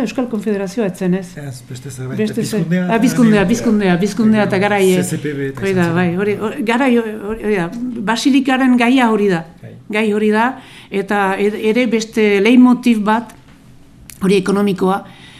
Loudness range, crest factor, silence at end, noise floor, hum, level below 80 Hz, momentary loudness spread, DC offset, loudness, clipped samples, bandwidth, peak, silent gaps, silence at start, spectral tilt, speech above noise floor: 3 LU; 14 dB; 0 s; -42 dBFS; none; -46 dBFS; 11 LU; under 0.1%; -15 LUFS; under 0.1%; 15 kHz; 0 dBFS; none; 0 s; -6 dB/octave; 27 dB